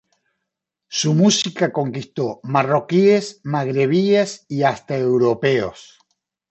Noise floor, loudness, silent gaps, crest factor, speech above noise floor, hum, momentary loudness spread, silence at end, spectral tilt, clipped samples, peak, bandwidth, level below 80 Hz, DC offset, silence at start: -81 dBFS; -19 LUFS; none; 16 dB; 63 dB; none; 10 LU; 0.65 s; -5 dB/octave; under 0.1%; -2 dBFS; 8.4 kHz; -62 dBFS; under 0.1%; 0.9 s